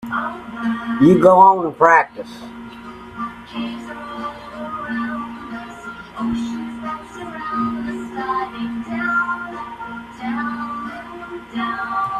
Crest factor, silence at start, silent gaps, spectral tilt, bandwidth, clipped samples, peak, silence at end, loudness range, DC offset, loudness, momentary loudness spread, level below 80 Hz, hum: 20 dB; 0 s; none; -7 dB/octave; 12.5 kHz; under 0.1%; 0 dBFS; 0 s; 13 LU; under 0.1%; -19 LUFS; 20 LU; -52 dBFS; none